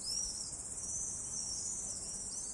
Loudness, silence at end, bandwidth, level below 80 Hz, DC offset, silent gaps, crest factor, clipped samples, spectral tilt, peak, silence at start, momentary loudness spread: -38 LUFS; 0 s; 12 kHz; -60 dBFS; under 0.1%; none; 14 dB; under 0.1%; -0.5 dB/octave; -28 dBFS; 0 s; 4 LU